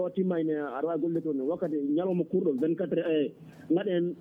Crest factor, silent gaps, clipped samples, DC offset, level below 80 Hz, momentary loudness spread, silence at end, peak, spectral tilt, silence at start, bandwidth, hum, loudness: 12 dB; none; under 0.1%; under 0.1%; -76 dBFS; 3 LU; 0 s; -16 dBFS; -9.5 dB/octave; 0 s; 3.7 kHz; none; -29 LUFS